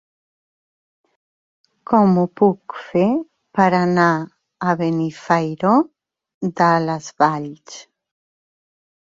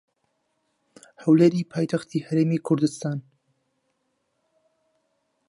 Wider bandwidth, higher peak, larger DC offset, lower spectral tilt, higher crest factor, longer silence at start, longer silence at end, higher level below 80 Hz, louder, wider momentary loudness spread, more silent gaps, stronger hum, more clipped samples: second, 7.6 kHz vs 11.5 kHz; first, -2 dBFS vs -6 dBFS; neither; about the same, -7 dB/octave vs -7.5 dB/octave; about the same, 18 dB vs 20 dB; first, 1.9 s vs 1.2 s; second, 1.25 s vs 2.3 s; first, -62 dBFS vs -72 dBFS; first, -18 LUFS vs -23 LUFS; about the same, 13 LU vs 13 LU; first, 6.34-6.41 s vs none; neither; neither